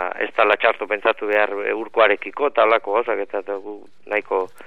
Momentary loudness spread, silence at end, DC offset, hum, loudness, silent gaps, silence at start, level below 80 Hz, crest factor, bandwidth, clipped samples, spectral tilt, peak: 11 LU; 0.2 s; 0.9%; none; -20 LUFS; none; 0 s; -72 dBFS; 20 dB; 5.4 kHz; under 0.1%; -4.5 dB/octave; 0 dBFS